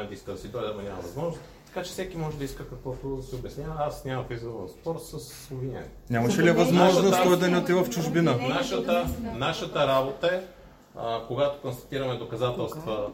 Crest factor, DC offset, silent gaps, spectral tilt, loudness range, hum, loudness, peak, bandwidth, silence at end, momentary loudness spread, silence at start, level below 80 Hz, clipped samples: 20 dB; under 0.1%; none; -5.5 dB/octave; 12 LU; none; -27 LUFS; -6 dBFS; 16.5 kHz; 0 s; 16 LU; 0 s; -50 dBFS; under 0.1%